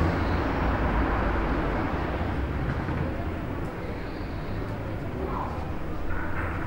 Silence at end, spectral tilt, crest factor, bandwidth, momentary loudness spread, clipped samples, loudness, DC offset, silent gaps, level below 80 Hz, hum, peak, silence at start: 0 s; -8 dB/octave; 16 dB; 16 kHz; 8 LU; under 0.1%; -30 LUFS; under 0.1%; none; -34 dBFS; none; -10 dBFS; 0 s